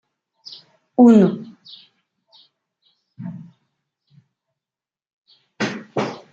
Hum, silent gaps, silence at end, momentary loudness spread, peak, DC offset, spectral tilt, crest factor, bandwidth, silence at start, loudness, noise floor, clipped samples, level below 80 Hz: none; 5.13-5.25 s; 0.15 s; 28 LU; -2 dBFS; under 0.1%; -7.5 dB/octave; 20 dB; 7.6 kHz; 1 s; -17 LUFS; under -90 dBFS; under 0.1%; -68 dBFS